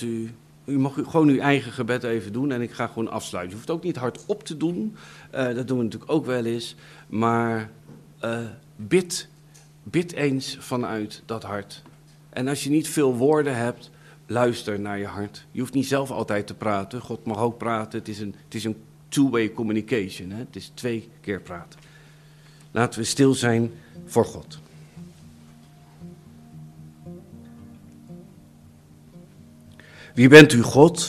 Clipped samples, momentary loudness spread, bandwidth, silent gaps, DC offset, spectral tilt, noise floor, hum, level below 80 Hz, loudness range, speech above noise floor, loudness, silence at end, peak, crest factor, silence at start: under 0.1%; 20 LU; 15 kHz; none; under 0.1%; -5.5 dB/octave; -51 dBFS; none; -60 dBFS; 20 LU; 28 dB; -23 LUFS; 0 s; 0 dBFS; 24 dB; 0 s